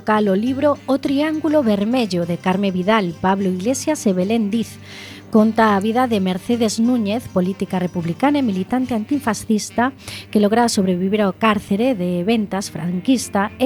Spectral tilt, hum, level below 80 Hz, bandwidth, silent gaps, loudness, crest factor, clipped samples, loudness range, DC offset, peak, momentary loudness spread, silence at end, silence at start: -5.5 dB/octave; none; -54 dBFS; 19 kHz; none; -19 LUFS; 16 dB; under 0.1%; 1 LU; under 0.1%; -2 dBFS; 6 LU; 0 s; 0 s